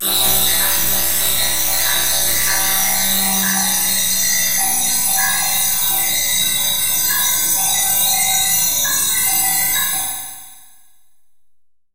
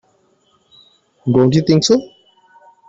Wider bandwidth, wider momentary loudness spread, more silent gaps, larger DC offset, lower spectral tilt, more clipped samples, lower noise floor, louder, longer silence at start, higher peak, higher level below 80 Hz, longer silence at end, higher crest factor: first, 16 kHz vs 8 kHz; second, 2 LU vs 5 LU; neither; neither; second, 0.5 dB/octave vs -6 dB/octave; neither; first, -67 dBFS vs -58 dBFS; about the same, -14 LUFS vs -14 LUFS; second, 0 s vs 1.25 s; about the same, -2 dBFS vs -2 dBFS; first, -44 dBFS vs -52 dBFS; first, 1.25 s vs 0.85 s; about the same, 16 dB vs 16 dB